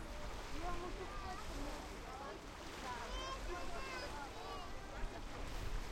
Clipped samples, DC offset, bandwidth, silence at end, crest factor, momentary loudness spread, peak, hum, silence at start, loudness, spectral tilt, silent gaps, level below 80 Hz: under 0.1%; under 0.1%; 16.5 kHz; 0 s; 14 dB; 4 LU; -30 dBFS; none; 0 s; -48 LUFS; -4 dB/octave; none; -50 dBFS